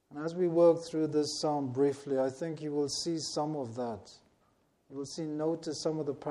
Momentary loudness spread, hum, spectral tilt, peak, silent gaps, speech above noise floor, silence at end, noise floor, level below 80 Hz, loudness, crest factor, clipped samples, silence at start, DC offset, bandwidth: 13 LU; none; -5.5 dB/octave; -14 dBFS; none; 39 dB; 0 s; -71 dBFS; -74 dBFS; -32 LUFS; 18 dB; under 0.1%; 0.1 s; under 0.1%; 12 kHz